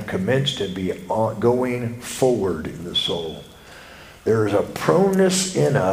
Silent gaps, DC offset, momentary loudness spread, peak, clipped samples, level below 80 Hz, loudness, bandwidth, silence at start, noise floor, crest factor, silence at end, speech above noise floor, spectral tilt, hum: none; under 0.1%; 11 LU; 0 dBFS; under 0.1%; -50 dBFS; -21 LUFS; 16 kHz; 0 s; -42 dBFS; 22 dB; 0 s; 22 dB; -5 dB/octave; none